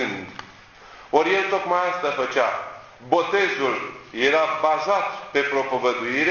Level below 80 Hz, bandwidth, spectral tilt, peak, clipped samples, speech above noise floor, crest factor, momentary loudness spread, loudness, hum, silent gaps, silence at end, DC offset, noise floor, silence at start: -62 dBFS; 7.2 kHz; -4 dB/octave; -4 dBFS; under 0.1%; 24 dB; 20 dB; 13 LU; -22 LUFS; none; none; 0 s; under 0.1%; -46 dBFS; 0 s